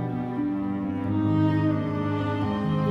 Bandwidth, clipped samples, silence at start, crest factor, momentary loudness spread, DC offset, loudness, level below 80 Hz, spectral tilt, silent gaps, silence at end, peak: 6.2 kHz; under 0.1%; 0 s; 12 dB; 6 LU; under 0.1%; -26 LUFS; -52 dBFS; -9.5 dB/octave; none; 0 s; -12 dBFS